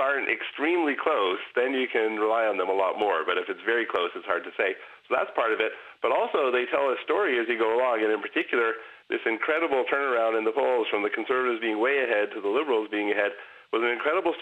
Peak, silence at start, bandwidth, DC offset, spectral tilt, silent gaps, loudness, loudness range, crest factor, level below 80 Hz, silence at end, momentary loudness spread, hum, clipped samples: -8 dBFS; 0 s; 9 kHz; under 0.1%; -4.5 dB/octave; none; -26 LUFS; 2 LU; 18 dB; -74 dBFS; 0 s; 4 LU; none; under 0.1%